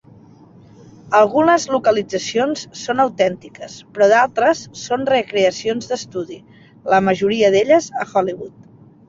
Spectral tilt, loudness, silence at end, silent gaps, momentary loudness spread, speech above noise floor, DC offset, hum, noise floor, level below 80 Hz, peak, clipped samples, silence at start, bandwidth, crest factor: -4 dB/octave; -17 LUFS; 0.6 s; none; 18 LU; 28 dB; under 0.1%; none; -45 dBFS; -58 dBFS; -2 dBFS; under 0.1%; 1.05 s; 7.8 kHz; 16 dB